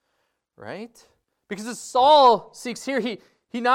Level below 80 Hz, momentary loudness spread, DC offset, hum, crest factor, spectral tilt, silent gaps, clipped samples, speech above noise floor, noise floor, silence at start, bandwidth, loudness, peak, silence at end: -66 dBFS; 23 LU; under 0.1%; none; 18 dB; -3 dB/octave; none; under 0.1%; 53 dB; -74 dBFS; 0.6 s; 15.5 kHz; -20 LUFS; -4 dBFS; 0 s